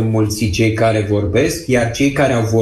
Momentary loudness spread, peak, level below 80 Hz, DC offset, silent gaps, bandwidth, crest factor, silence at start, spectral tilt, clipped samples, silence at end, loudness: 2 LU; -2 dBFS; -36 dBFS; under 0.1%; none; 13 kHz; 12 dB; 0 s; -6 dB/octave; under 0.1%; 0 s; -15 LUFS